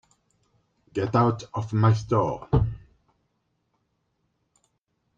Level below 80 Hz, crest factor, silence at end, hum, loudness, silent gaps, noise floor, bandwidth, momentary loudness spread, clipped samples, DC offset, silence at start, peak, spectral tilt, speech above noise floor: -44 dBFS; 20 dB; 2.4 s; none; -25 LUFS; none; -75 dBFS; 7.4 kHz; 10 LU; under 0.1%; under 0.1%; 0.95 s; -8 dBFS; -8 dB/octave; 52 dB